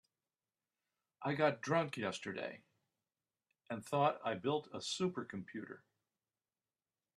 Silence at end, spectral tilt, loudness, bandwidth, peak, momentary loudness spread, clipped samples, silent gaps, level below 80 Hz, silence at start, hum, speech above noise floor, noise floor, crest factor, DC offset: 1.4 s; -5 dB/octave; -39 LUFS; 13 kHz; -18 dBFS; 14 LU; under 0.1%; none; -82 dBFS; 1.2 s; none; over 52 dB; under -90 dBFS; 22 dB; under 0.1%